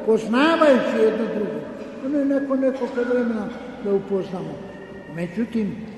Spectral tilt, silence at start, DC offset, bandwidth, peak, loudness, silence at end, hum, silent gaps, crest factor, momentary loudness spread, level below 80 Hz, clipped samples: -6.5 dB/octave; 0 s; under 0.1%; 12 kHz; -4 dBFS; -22 LUFS; 0 s; none; none; 18 dB; 16 LU; -56 dBFS; under 0.1%